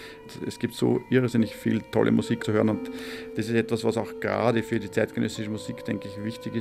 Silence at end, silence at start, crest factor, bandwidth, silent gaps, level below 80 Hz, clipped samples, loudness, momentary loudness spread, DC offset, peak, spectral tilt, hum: 0 s; 0 s; 20 dB; 15 kHz; none; -60 dBFS; under 0.1%; -27 LUFS; 11 LU; under 0.1%; -6 dBFS; -6.5 dB/octave; none